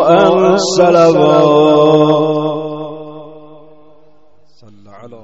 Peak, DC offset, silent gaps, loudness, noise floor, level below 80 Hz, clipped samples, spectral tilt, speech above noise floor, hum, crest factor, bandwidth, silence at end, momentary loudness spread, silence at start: 0 dBFS; 0.8%; none; -10 LUFS; -52 dBFS; -54 dBFS; under 0.1%; -6 dB/octave; 44 dB; none; 12 dB; 8.2 kHz; 0.1 s; 17 LU; 0 s